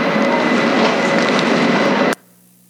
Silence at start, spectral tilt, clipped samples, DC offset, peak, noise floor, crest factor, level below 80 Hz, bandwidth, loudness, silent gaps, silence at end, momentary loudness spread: 0 s; -5 dB/octave; under 0.1%; under 0.1%; -2 dBFS; -49 dBFS; 14 dB; -68 dBFS; 15.5 kHz; -15 LUFS; none; 0.55 s; 3 LU